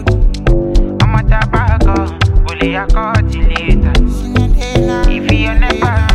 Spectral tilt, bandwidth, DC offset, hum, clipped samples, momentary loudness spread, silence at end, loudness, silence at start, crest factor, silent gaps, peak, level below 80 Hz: -6.5 dB/octave; 9.2 kHz; 0.5%; none; under 0.1%; 3 LU; 0 s; -13 LUFS; 0 s; 10 dB; none; 0 dBFS; -12 dBFS